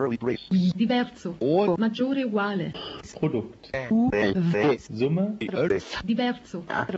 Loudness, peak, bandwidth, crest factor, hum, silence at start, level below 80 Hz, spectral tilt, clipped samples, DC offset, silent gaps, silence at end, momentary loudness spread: -26 LUFS; -10 dBFS; 8 kHz; 14 dB; none; 0 s; -56 dBFS; -7 dB/octave; under 0.1%; under 0.1%; none; 0 s; 9 LU